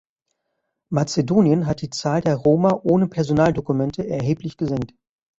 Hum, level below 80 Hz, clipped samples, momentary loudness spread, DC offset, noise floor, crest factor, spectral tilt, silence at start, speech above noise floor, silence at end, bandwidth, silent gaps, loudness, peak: none; -50 dBFS; under 0.1%; 8 LU; under 0.1%; -76 dBFS; 16 dB; -7 dB/octave; 0.9 s; 57 dB; 0.55 s; 8 kHz; none; -20 LUFS; -4 dBFS